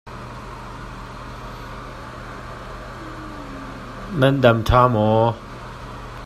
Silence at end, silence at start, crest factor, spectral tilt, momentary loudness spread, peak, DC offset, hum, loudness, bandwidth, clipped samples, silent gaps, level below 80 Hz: 0 s; 0.05 s; 22 dB; -7 dB/octave; 20 LU; 0 dBFS; under 0.1%; none; -17 LUFS; 14 kHz; under 0.1%; none; -36 dBFS